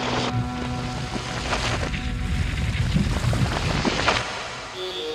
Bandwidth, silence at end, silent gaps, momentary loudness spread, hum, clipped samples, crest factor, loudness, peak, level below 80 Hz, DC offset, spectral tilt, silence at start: 13.5 kHz; 0 s; none; 7 LU; none; under 0.1%; 18 dB; -25 LUFS; -6 dBFS; -32 dBFS; under 0.1%; -5 dB/octave; 0 s